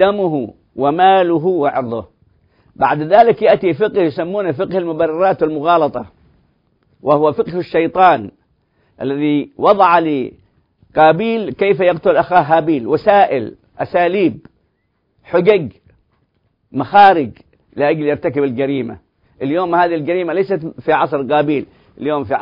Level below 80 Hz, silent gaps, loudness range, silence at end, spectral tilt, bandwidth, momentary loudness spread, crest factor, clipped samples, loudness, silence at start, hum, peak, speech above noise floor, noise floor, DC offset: -54 dBFS; none; 4 LU; 0 s; -9 dB/octave; 5.4 kHz; 12 LU; 16 dB; under 0.1%; -15 LUFS; 0 s; none; 0 dBFS; 51 dB; -65 dBFS; under 0.1%